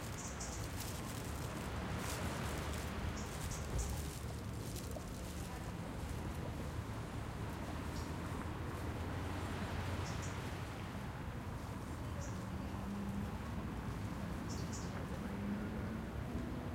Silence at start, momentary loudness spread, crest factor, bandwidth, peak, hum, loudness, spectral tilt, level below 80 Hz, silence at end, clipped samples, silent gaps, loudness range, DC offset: 0 s; 4 LU; 14 dB; 16.5 kHz; -28 dBFS; none; -44 LUFS; -5.5 dB/octave; -50 dBFS; 0 s; under 0.1%; none; 2 LU; under 0.1%